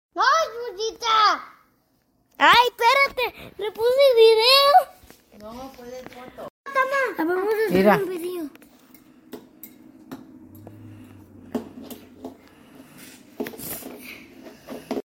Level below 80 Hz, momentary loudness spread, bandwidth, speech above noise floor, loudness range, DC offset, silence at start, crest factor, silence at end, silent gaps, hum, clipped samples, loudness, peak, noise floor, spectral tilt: -60 dBFS; 26 LU; 16.5 kHz; 46 dB; 23 LU; under 0.1%; 0.15 s; 22 dB; 0.1 s; 6.50-6.64 s; none; under 0.1%; -19 LUFS; -2 dBFS; -66 dBFS; -3.5 dB/octave